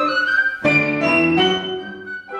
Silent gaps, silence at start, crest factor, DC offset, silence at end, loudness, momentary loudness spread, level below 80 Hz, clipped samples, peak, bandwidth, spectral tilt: none; 0 s; 14 dB; under 0.1%; 0 s; -16 LUFS; 14 LU; -54 dBFS; under 0.1%; -4 dBFS; 10 kHz; -5 dB/octave